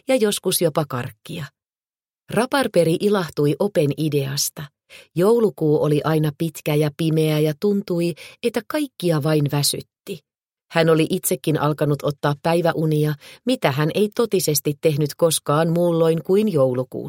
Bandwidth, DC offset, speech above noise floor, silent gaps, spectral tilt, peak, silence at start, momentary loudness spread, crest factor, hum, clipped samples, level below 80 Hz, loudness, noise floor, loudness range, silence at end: 17 kHz; under 0.1%; over 70 dB; none; -5.5 dB/octave; 0 dBFS; 0.1 s; 9 LU; 20 dB; none; under 0.1%; -62 dBFS; -20 LUFS; under -90 dBFS; 2 LU; 0 s